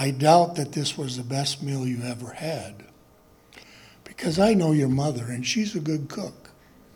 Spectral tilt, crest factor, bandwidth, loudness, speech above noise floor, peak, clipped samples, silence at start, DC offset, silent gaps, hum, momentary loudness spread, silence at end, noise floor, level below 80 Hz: -5.5 dB/octave; 20 dB; 18.5 kHz; -25 LUFS; 32 dB; -4 dBFS; under 0.1%; 0 s; under 0.1%; none; none; 15 LU; 0.65 s; -56 dBFS; -58 dBFS